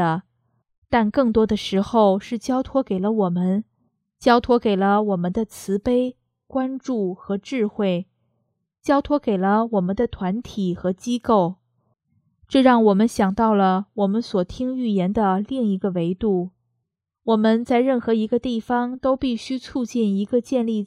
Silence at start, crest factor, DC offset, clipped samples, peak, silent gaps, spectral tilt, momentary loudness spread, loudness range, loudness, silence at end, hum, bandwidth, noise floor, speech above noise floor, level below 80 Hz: 0 s; 20 dB; under 0.1%; under 0.1%; -2 dBFS; 0.78-0.82 s; -7 dB/octave; 8 LU; 4 LU; -21 LUFS; 0 s; none; 13.5 kHz; -78 dBFS; 58 dB; -50 dBFS